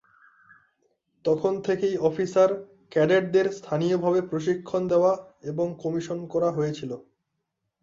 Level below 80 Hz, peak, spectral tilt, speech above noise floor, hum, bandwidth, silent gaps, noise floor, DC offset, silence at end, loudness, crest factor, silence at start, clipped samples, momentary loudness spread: -66 dBFS; -8 dBFS; -7 dB/octave; 56 dB; none; 7.6 kHz; none; -80 dBFS; under 0.1%; 0.8 s; -25 LUFS; 16 dB; 1.25 s; under 0.1%; 9 LU